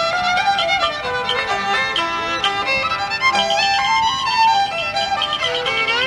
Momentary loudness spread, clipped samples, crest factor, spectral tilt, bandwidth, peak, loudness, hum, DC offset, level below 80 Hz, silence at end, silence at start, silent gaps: 4 LU; under 0.1%; 14 dB; -1.5 dB/octave; 13 kHz; -4 dBFS; -17 LUFS; none; under 0.1%; -48 dBFS; 0 s; 0 s; none